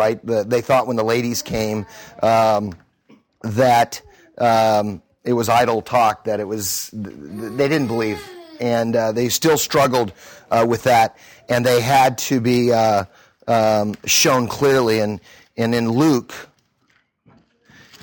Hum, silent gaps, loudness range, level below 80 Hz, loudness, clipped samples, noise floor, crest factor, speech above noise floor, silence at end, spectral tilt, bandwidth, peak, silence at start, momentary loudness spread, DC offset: none; none; 4 LU; -54 dBFS; -18 LUFS; under 0.1%; -63 dBFS; 16 dB; 45 dB; 1.6 s; -4.5 dB/octave; 19 kHz; -4 dBFS; 0 s; 15 LU; under 0.1%